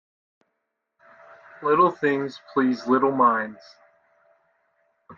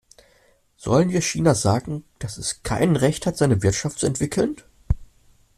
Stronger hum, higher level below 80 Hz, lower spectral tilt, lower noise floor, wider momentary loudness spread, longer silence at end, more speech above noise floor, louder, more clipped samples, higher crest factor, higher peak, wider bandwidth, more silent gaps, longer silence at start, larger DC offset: neither; second, -74 dBFS vs -38 dBFS; first, -7 dB/octave vs -5.5 dB/octave; first, -79 dBFS vs -59 dBFS; about the same, 9 LU vs 11 LU; second, 0.05 s vs 0.55 s; first, 57 dB vs 38 dB; about the same, -22 LUFS vs -22 LUFS; neither; about the same, 20 dB vs 18 dB; about the same, -6 dBFS vs -4 dBFS; second, 7.2 kHz vs 14 kHz; neither; first, 1.6 s vs 0.8 s; neither